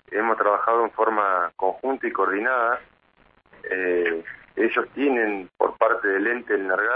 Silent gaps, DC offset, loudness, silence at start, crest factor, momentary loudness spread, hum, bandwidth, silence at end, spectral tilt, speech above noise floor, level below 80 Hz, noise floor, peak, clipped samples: none; under 0.1%; -23 LUFS; 0.1 s; 20 dB; 6 LU; none; 4.9 kHz; 0 s; -8 dB/octave; 37 dB; -66 dBFS; -60 dBFS; -4 dBFS; under 0.1%